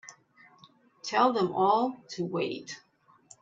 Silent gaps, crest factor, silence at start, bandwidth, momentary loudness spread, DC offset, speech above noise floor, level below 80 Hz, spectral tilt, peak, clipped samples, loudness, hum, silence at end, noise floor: none; 20 dB; 0.05 s; 8 kHz; 17 LU; under 0.1%; 32 dB; -78 dBFS; -5 dB/octave; -10 dBFS; under 0.1%; -28 LUFS; none; 0.65 s; -60 dBFS